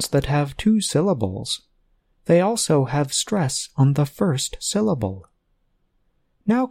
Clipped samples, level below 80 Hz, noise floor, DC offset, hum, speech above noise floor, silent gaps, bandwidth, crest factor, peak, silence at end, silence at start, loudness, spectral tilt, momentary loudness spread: under 0.1%; -46 dBFS; -66 dBFS; under 0.1%; none; 46 dB; none; 16 kHz; 18 dB; -4 dBFS; 0 s; 0 s; -21 LUFS; -5 dB/octave; 9 LU